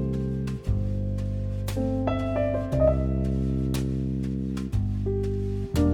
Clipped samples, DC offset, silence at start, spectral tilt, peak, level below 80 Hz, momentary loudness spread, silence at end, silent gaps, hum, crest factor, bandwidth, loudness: under 0.1%; under 0.1%; 0 s; -8.5 dB/octave; -10 dBFS; -32 dBFS; 6 LU; 0 s; none; none; 16 dB; 16 kHz; -27 LUFS